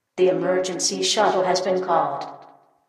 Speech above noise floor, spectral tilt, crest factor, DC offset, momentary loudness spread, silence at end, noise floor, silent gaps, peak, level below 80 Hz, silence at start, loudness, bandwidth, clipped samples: 29 dB; -3 dB/octave; 16 dB; under 0.1%; 7 LU; 0.45 s; -50 dBFS; none; -6 dBFS; -74 dBFS; 0.15 s; -21 LUFS; 13 kHz; under 0.1%